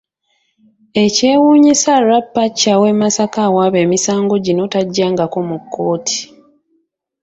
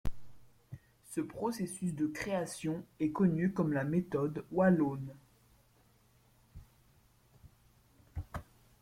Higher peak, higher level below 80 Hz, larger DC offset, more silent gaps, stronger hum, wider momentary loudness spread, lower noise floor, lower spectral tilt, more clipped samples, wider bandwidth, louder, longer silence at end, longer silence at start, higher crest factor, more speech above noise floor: first, 0 dBFS vs -16 dBFS; about the same, -56 dBFS vs -56 dBFS; neither; neither; neither; second, 10 LU vs 18 LU; about the same, -64 dBFS vs -67 dBFS; second, -4 dB/octave vs -7 dB/octave; neither; second, 8.2 kHz vs 15.5 kHz; first, -13 LUFS vs -34 LUFS; first, 0.95 s vs 0.4 s; first, 0.95 s vs 0.05 s; second, 14 dB vs 20 dB; first, 51 dB vs 34 dB